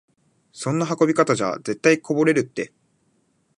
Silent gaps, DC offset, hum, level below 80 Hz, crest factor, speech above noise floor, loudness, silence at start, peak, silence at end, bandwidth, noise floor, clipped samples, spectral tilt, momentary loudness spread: none; under 0.1%; none; -68 dBFS; 18 dB; 45 dB; -21 LUFS; 0.55 s; -4 dBFS; 0.95 s; 11.5 kHz; -66 dBFS; under 0.1%; -5.5 dB/octave; 12 LU